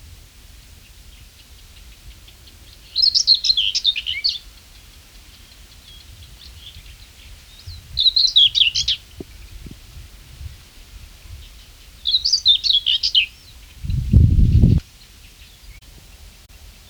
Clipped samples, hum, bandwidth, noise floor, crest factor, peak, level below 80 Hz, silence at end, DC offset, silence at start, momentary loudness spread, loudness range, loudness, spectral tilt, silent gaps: under 0.1%; none; over 20 kHz; -45 dBFS; 22 dB; 0 dBFS; -30 dBFS; 1.15 s; under 0.1%; 2.05 s; 27 LU; 9 LU; -15 LUFS; -3 dB/octave; none